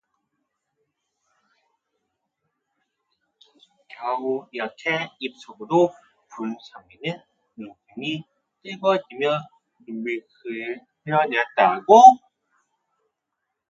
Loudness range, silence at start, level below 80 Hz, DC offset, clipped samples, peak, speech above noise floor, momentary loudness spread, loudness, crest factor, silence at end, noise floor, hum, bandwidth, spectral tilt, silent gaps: 13 LU; 4 s; -74 dBFS; under 0.1%; under 0.1%; 0 dBFS; 60 dB; 23 LU; -21 LUFS; 24 dB; 1.5 s; -81 dBFS; none; 7.4 kHz; -5 dB/octave; none